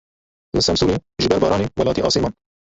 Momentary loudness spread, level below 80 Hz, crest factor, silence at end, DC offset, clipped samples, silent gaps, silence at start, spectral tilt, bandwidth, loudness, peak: 5 LU; -38 dBFS; 18 dB; 0.4 s; under 0.1%; under 0.1%; none; 0.55 s; -5 dB/octave; 8.4 kHz; -19 LUFS; -2 dBFS